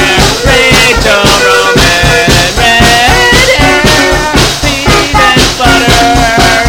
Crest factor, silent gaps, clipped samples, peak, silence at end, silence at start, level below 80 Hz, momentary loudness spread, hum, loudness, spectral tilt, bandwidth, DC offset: 6 dB; none; 6%; 0 dBFS; 0 s; 0 s; -16 dBFS; 3 LU; none; -5 LUFS; -3 dB/octave; over 20 kHz; under 0.1%